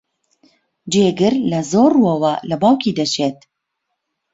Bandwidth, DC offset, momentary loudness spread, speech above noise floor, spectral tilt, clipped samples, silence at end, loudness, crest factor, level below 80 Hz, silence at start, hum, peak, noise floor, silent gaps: 8 kHz; under 0.1%; 6 LU; 60 dB; -5.5 dB/octave; under 0.1%; 1 s; -16 LUFS; 16 dB; -56 dBFS; 0.85 s; none; -2 dBFS; -75 dBFS; none